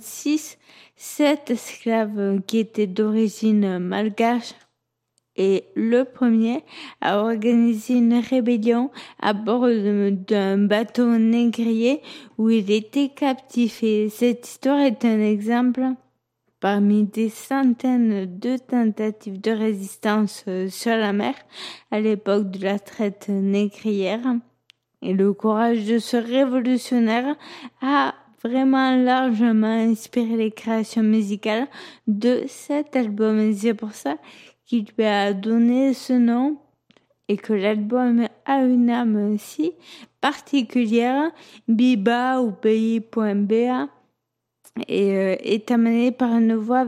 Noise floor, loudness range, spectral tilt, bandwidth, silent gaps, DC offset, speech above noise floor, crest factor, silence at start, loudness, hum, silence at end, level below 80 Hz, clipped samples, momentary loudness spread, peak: -79 dBFS; 3 LU; -6 dB/octave; 14.5 kHz; none; under 0.1%; 58 dB; 14 dB; 0 s; -21 LUFS; none; 0 s; -76 dBFS; under 0.1%; 9 LU; -6 dBFS